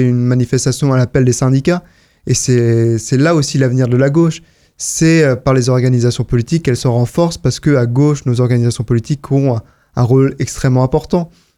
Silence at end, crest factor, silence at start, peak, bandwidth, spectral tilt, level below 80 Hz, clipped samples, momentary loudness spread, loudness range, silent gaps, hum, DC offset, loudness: 0.3 s; 12 dB; 0 s; 0 dBFS; 13 kHz; -6 dB/octave; -38 dBFS; under 0.1%; 6 LU; 1 LU; none; none; under 0.1%; -13 LUFS